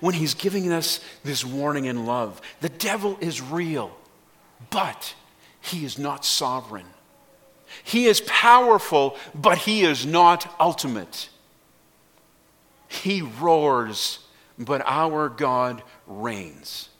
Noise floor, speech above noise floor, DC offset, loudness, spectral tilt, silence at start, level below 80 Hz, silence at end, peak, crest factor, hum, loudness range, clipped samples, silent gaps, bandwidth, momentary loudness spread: -58 dBFS; 36 dB; under 0.1%; -22 LUFS; -3.5 dB/octave; 0 s; -68 dBFS; 0.15 s; 0 dBFS; 22 dB; none; 10 LU; under 0.1%; none; 17.5 kHz; 18 LU